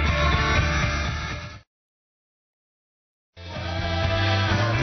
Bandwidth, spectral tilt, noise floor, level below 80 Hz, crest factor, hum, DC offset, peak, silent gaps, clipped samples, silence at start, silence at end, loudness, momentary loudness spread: 6.4 kHz; -5 dB/octave; under -90 dBFS; -32 dBFS; 16 dB; none; under 0.1%; -10 dBFS; 1.67-3.33 s; under 0.1%; 0 s; 0 s; -23 LUFS; 15 LU